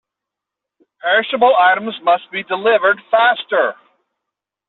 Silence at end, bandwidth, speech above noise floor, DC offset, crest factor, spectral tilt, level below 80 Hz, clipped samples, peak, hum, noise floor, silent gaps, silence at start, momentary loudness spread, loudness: 0.95 s; 4.3 kHz; 69 dB; under 0.1%; 16 dB; 0.5 dB/octave; -70 dBFS; under 0.1%; -2 dBFS; none; -83 dBFS; none; 1.05 s; 7 LU; -15 LUFS